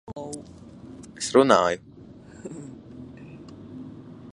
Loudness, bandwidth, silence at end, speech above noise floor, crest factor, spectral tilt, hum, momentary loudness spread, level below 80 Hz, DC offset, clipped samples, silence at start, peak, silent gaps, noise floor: -22 LUFS; 11.5 kHz; 0.05 s; 24 dB; 26 dB; -4.5 dB/octave; none; 25 LU; -58 dBFS; under 0.1%; under 0.1%; 0.1 s; -2 dBFS; none; -46 dBFS